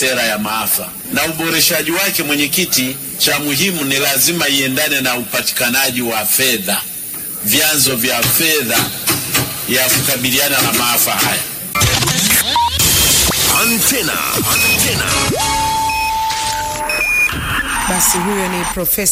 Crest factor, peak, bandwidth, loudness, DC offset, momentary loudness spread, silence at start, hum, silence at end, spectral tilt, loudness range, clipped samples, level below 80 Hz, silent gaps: 14 dB; 0 dBFS; 16 kHz; -13 LUFS; under 0.1%; 6 LU; 0 s; none; 0 s; -2 dB/octave; 3 LU; under 0.1%; -36 dBFS; none